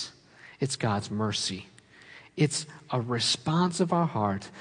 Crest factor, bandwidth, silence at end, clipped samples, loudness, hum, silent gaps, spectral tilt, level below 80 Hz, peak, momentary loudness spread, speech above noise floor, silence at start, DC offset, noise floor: 18 dB; 10.5 kHz; 0 s; under 0.1%; -28 LUFS; none; none; -4.5 dB/octave; -70 dBFS; -12 dBFS; 10 LU; 25 dB; 0 s; under 0.1%; -53 dBFS